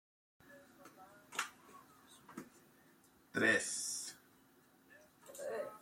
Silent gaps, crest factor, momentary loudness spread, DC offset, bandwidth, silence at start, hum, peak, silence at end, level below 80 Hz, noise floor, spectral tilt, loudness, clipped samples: none; 24 dB; 28 LU; under 0.1%; 16.5 kHz; 0.45 s; none; -20 dBFS; 0 s; -86 dBFS; -68 dBFS; -2 dB/octave; -38 LUFS; under 0.1%